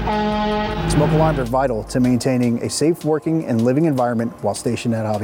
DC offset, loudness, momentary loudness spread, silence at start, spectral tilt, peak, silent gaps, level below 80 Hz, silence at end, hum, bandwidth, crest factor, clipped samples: under 0.1%; -19 LUFS; 5 LU; 0 s; -6 dB/octave; -4 dBFS; none; -34 dBFS; 0 s; none; 17 kHz; 14 dB; under 0.1%